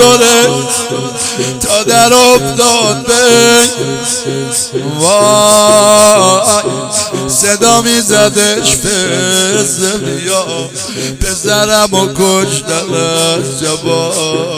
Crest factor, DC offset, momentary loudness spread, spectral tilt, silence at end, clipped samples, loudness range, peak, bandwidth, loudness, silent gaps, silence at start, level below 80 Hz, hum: 10 dB; under 0.1%; 9 LU; -2.5 dB/octave; 0 s; 1%; 4 LU; 0 dBFS; over 20 kHz; -9 LUFS; none; 0 s; -36 dBFS; none